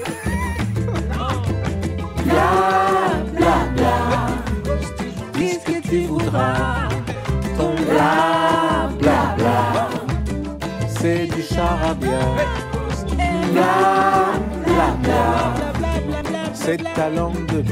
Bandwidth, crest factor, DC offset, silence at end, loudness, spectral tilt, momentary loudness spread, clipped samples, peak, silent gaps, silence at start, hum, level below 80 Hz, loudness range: 16 kHz; 18 dB; under 0.1%; 0 s; -19 LUFS; -6 dB/octave; 8 LU; under 0.1%; -2 dBFS; none; 0 s; none; -30 dBFS; 3 LU